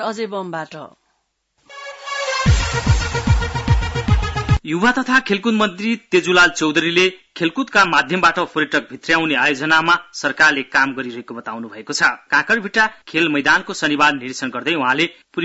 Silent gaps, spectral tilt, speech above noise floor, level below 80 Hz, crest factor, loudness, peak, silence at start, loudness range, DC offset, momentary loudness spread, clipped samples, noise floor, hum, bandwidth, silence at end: none; -4.5 dB/octave; 51 dB; -30 dBFS; 14 dB; -17 LUFS; -4 dBFS; 0 s; 4 LU; under 0.1%; 13 LU; under 0.1%; -68 dBFS; none; 8 kHz; 0 s